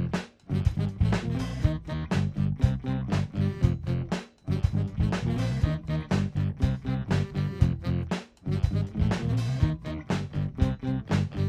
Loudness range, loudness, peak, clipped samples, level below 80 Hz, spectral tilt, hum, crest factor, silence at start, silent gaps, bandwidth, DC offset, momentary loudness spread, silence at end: 1 LU; -29 LUFS; -8 dBFS; under 0.1%; -36 dBFS; -7.5 dB/octave; none; 18 dB; 0 s; none; 10.5 kHz; under 0.1%; 5 LU; 0 s